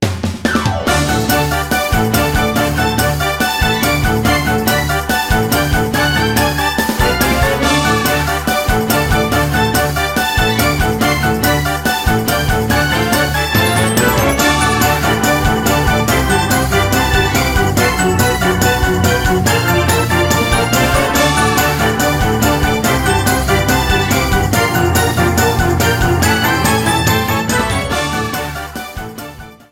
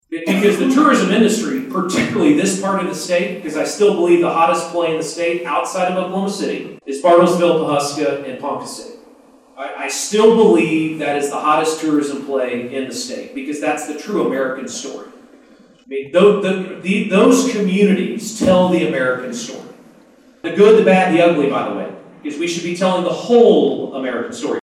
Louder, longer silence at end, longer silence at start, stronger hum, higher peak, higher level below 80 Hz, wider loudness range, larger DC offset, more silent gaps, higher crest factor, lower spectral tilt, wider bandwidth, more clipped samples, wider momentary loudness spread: first, -13 LUFS vs -16 LUFS; first, 0.15 s vs 0 s; about the same, 0 s vs 0.1 s; neither; about the same, 0 dBFS vs 0 dBFS; first, -24 dBFS vs -62 dBFS; second, 1 LU vs 5 LU; neither; neither; about the same, 14 dB vs 16 dB; about the same, -4 dB/octave vs -5 dB/octave; first, 17.5 kHz vs 15 kHz; neither; second, 3 LU vs 14 LU